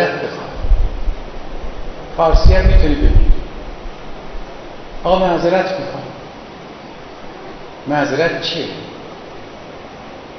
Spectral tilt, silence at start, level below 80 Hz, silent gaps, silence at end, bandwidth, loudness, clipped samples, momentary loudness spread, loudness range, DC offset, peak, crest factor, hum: -6.5 dB/octave; 0 s; -18 dBFS; none; 0 s; 6.4 kHz; -17 LUFS; 0.3%; 20 LU; 5 LU; under 0.1%; 0 dBFS; 16 dB; none